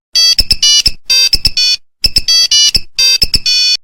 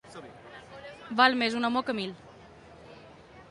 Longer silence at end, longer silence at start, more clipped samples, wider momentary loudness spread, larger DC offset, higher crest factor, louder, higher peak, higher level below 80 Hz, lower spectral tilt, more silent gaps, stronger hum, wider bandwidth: about the same, 0.05 s vs 0.1 s; about the same, 0.15 s vs 0.05 s; neither; second, 5 LU vs 27 LU; neither; second, 10 dB vs 24 dB; first, -7 LUFS vs -27 LUFS; first, 0 dBFS vs -8 dBFS; first, -26 dBFS vs -66 dBFS; second, 1 dB/octave vs -4 dB/octave; neither; neither; first, 18.5 kHz vs 11.5 kHz